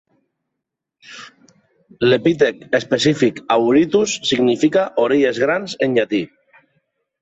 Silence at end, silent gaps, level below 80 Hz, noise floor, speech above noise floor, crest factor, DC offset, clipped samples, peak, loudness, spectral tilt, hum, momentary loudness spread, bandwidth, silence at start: 0.95 s; none; -58 dBFS; -80 dBFS; 64 dB; 16 dB; under 0.1%; under 0.1%; -2 dBFS; -17 LUFS; -5 dB/octave; none; 7 LU; 8.4 kHz; 1.1 s